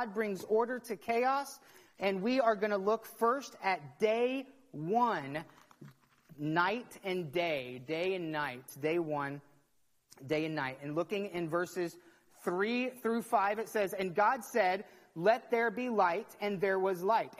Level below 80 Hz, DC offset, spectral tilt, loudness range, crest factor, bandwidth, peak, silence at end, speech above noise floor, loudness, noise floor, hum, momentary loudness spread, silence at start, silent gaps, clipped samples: -78 dBFS; under 0.1%; -5.5 dB/octave; 5 LU; 20 dB; 15 kHz; -14 dBFS; 0.05 s; 40 dB; -34 LUFS; -73 dBFS; none; 9 LU; 0 s; none; under 0.1%